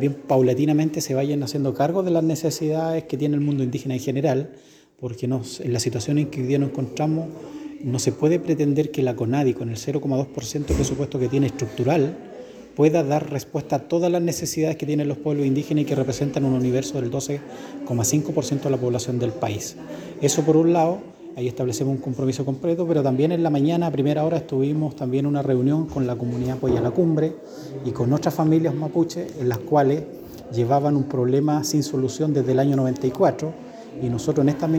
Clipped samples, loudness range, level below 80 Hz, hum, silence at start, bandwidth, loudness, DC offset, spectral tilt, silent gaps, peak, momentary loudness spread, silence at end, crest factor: under 0.1%; 3 LU; -48 dBFS; none; 0 s; 19.5 kHz; -22 LUFS; under 0.1%; -6.5 dB/octave; none; -6 dBFS; 9 LU; 0 s; 16 dB